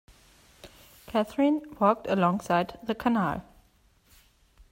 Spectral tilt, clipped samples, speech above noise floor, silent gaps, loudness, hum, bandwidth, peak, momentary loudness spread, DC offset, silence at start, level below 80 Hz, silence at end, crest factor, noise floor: -7 dB/octave; under 0.1%; 37 dB; none; -27 LUFS; none; 16 kHz; -10 dBFS; 6 LU; under 0.1%; 0.65 s; -58 dBFS; 1.3 s; 20 dB; -63 dBFS